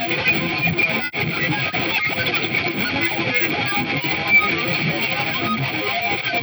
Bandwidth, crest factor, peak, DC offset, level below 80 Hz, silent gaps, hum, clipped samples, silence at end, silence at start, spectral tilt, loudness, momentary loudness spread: over 20 kHz; 16 dB; -6 dBFS; under 0.1%; -54 dBFS; none; none; under 0.1%; 0 s; 0 s; -5 dB/octave; -19 LUFS; 6 LU